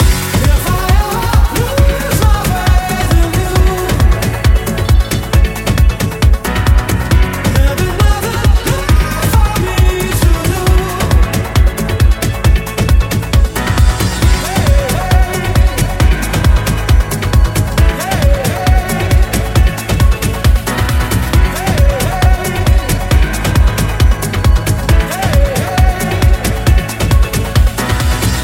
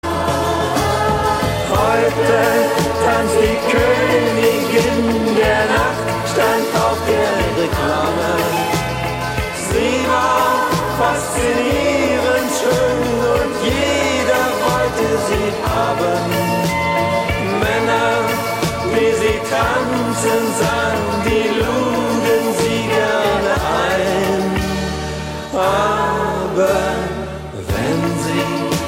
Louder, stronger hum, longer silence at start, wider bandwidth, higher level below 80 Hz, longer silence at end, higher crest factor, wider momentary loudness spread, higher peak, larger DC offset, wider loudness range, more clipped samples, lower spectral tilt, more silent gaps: first, -13 LUFS vs -16 LUFS; neither; about the same, 0 s vs 0.05 s; about the same, 17 kHz vs 16.5 kHz; first, -12 dBFS vs -34 dBFS; about the same, 0 s vs 0 s; about the same, 10 dB vs 14 dB; second, 1 LU vs 4 LU; about the same, 0 dBFS vs -2 dBFS; neither; second, 0 LU vs 3 LU; neither; about the same, -5 dB/octave vs -4.5 dB/octave; neither